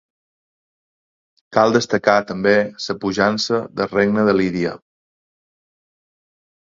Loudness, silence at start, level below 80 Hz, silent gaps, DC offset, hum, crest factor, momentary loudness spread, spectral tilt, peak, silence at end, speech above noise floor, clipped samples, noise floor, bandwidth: -18 LUFS; 1.5 s; -56 dBFS; none; under 0.1%; none; 20 dB; 8 LU; -5 dB/octave; 0 dBFS; 2 s; over 73 dB; under 0.1%; under -90 dBFS; 7.6 kHz